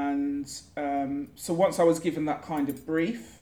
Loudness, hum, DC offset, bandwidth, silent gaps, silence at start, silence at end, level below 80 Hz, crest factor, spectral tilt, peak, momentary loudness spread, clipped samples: -28 LUFS; none; under 0.1%; over 20 kHz; none; 0 s; 0.05 s; -62 dBFS; 18 dB; -5.5 dB/octave; -10 dBFS; 11 LU; under 0.1%